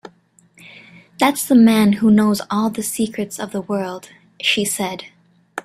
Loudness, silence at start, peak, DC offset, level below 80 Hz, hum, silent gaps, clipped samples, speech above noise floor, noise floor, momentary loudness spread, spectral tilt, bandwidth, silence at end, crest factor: -17 LUFS; 1.2 s; -2 dBFS; under 0.1%; -58 dBFS; none; none; under 0.1%; 37 dB; -54 dBFS; 14 LU; -4.5 dB/octave; 15 kHz; 0.05 s; 18 dB